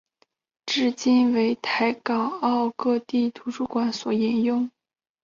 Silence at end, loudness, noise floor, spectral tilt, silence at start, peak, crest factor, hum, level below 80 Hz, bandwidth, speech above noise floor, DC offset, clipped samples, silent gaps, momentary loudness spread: 0.55 s; -24 LUFS; -68 dBFS; -4.5 dB/octave; 0.65 s; -10 dBFS; 14 dB; none; -68 dBFS; 7.4 kHz; 45 dB; under 0.1%; under 0.1%; none; 8 LU